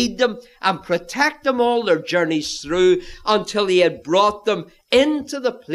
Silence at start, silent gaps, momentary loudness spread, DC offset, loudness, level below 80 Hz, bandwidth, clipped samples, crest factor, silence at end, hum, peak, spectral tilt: 0 s; none; 7 LU; under 0.1%; -19 LUFS; -50 dBFS; 13 kHz; under 0.1%; 16 dB; 0 s; none; -2 dBFS; -4 dB/octave